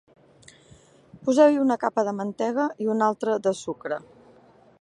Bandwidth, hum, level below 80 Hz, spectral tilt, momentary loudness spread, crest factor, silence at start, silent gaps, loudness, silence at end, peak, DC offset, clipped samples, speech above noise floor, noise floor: 11 kHz; none; -70 dBFS; -5.5 dB/octave; 13 LU; 20 dB; 1.15 s; none; -24 LUFS; 0.85 s; -6 dBFS; under 0.1%; under 0.1%; 31 dB; -54 dBFS